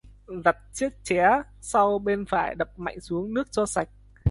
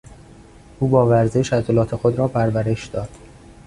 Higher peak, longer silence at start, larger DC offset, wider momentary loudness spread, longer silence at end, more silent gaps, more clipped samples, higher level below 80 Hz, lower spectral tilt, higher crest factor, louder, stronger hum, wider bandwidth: about the same, -4 dBFS vs -2 dBFS; second, 0.05 s vs 0.8 s; neither; second, 9 LU vs 12 LU; second, 0 s vs 0.5 s; neither; neither; about the same, -48 dBFS vs -44 dBFS; second, -5.5 dB/octave vs -7.5 dB/octave; about the same, 22 dB vs 18 dB; second, -26 LUFS vs -19 LUFS; neither; about the same, 11.5 kHz vs 11 kHz